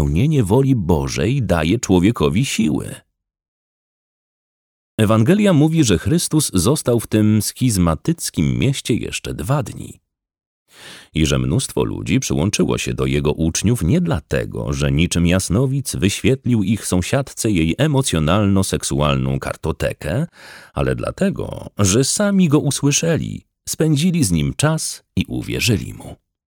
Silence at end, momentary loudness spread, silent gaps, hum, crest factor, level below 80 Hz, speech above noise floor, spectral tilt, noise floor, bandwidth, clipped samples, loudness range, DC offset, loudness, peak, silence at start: 0.3 s; 9 LU; 3.48-4.98 s, 10.46-10.65 s; none; 16 dB; -34 dBFS; over 73 dB; -5.5 dB/octave; under -90 dBFS; 19.5 kHz; under 0.1%; 5 LU; under 0.1%; -18 LUFS; -2 dBFS; 0 s